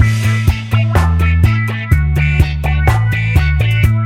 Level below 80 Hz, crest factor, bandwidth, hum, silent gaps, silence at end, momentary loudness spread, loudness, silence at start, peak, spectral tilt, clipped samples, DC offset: -18 dBFS; 10 dB; 15.5 kHz; none; none; 0 s; 2 LU; -13 LUFS; 0 s; 0 dBFS; -6.5 dB/octave; under 0.1%; under 0.1%